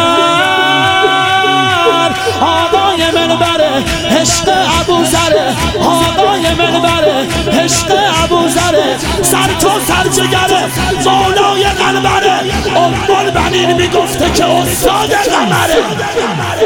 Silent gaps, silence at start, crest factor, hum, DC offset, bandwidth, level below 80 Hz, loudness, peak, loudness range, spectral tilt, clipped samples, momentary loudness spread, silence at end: none; 0 s; 10 dB; none; under 0.1%; 18 kHz; -30 dBFS; -10 LUFS; 0 dBFS; 1 LU; -3.5 dB/octave; under 0.1%; 3 LU; 0 s